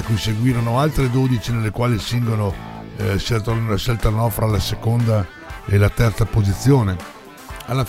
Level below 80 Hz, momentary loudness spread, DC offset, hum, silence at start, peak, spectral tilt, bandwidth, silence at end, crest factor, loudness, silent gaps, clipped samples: -32 dBFS; 13 LU; under 0.1%; none; 0 s; -4 dBFS; -6.5 dB/octave; 16 kHz; 0 s; 16 dB; -19 LUFS; none; under 0.1%